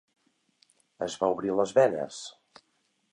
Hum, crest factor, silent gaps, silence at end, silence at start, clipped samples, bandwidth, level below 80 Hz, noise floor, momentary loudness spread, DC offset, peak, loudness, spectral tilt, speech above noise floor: none; 20 dB; none; 0.8 s; 1 s; under 0.1%; 10.5 kHz; -70 dBFS; -73 dBFS; 16 LU; under 0.1%; -10 dBFS; -27 LUFS; -4.5 dB/octave; 47 dB